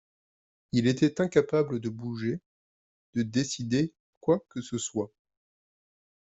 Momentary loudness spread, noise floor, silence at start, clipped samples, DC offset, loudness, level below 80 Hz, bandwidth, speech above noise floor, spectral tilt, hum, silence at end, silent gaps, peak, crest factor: 10 LU; under -90 dBFS; 0.75 s; under 0.1%; under 0.1%; -29 LUFS; -66 dBFS; 8.2 kHz; over 62 dB; -5.5 dB/octave; none; 1.15 s; 2.46-3.13 s, 4.00-4.21 s; -8 dBFS; 22 dB